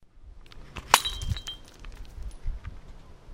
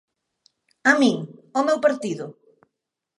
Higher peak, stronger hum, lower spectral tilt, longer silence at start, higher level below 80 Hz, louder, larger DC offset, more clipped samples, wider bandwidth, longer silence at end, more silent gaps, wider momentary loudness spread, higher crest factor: first, 0 dBFS vs -4 dBFS; neither; second, -1.5 dB/octave vs -4.5 dB/octave; second, 0 s vs 0.85 s; first, -40 dBFS vs -78 dBFS; second, -27 LUFS vs -21 LUFS; neither; neither; first, 16 kHz vs 11.5 kHz; second, 0 s vs 0.85 s; neither; first, 25 LU vs 14 LU; first, 32 dB vs 20 dB